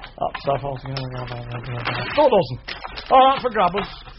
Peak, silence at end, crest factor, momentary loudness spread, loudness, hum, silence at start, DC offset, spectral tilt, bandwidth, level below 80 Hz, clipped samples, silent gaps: -2 dBFS; 0.05 s; 18 dB; 16 LU; -20 LUFS; none; 0 s; under 0.1%; -3.5 dB/octave; 6 kHz; -44 dBFS; under 0.1%; none